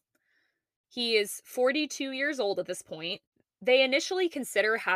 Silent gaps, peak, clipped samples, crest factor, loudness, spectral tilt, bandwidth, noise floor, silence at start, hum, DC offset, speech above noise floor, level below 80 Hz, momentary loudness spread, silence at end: 3.27-3.32 s; -10 dBFS; under 0.1%; 20 dB; -28 LUFS; -2 dB/octave; 15.5 kHz; -75 dBFS; 0.95 s; none; under 0.1%; 46 dB; -82 dBFS; 12 LU; 0 s